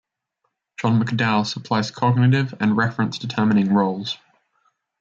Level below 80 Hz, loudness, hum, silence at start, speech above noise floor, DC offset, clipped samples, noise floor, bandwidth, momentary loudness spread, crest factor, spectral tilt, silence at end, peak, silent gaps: -64 dBFS; -20 LUFS; none; 0.8 s; 55 dB; under 0.1%; under 0.1%; -75 dBFS; 7.6 kHz; 9 LU; 16 dB; -6.5 dB/octave; 0.85 s; -6 dBFS; none